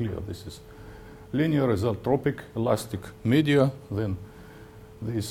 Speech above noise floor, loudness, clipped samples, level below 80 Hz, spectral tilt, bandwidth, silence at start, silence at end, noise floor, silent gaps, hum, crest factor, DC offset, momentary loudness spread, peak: 20 dB; -26 LUFS; under 0.1%; -52 dBFS; -7 dB/octave; 17 kHz; 0 s; 0 s; -46 dBFS; none; none; 20 dB; under 0.1%; 23 LU; -8 dBFS